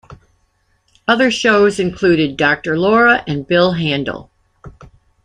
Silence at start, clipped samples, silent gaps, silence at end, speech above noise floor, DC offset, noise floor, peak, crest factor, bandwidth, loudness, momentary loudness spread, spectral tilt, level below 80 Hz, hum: 0.1 s; under 0.1%; none; 0.55 s; 47 dB; under 0.1%; -61 dBFS; 0 dBFS; 16 dB; 10.5 kHz; -14 LUFS; 8 LU; -5.5 dB/octave; -46 dBFS; none